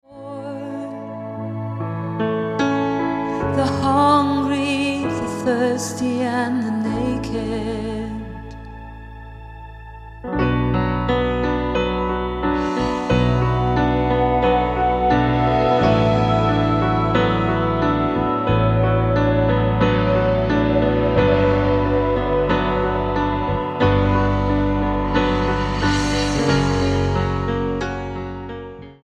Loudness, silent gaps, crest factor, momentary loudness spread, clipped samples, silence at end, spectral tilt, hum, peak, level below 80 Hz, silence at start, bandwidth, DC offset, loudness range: -19 LUFS; none; 18 dB; 13 LU; under 0.1%; 0.1 s; -7 dB/octave; none; -2 dBFS; -32 dBFS; 0.1 s; 11.5 kHz; under 0.1%; 7 LU